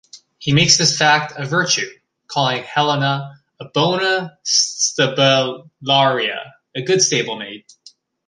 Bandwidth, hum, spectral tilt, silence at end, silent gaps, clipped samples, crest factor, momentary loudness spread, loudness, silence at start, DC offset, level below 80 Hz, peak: 11 kHz; none; -2.5 dB/octave; 0.7 s; none; under 0.1%; 18 dB; 15 LU; -16 LUFS; 0.15 s; under 0.1%; -56 dBFS; 0 dBFS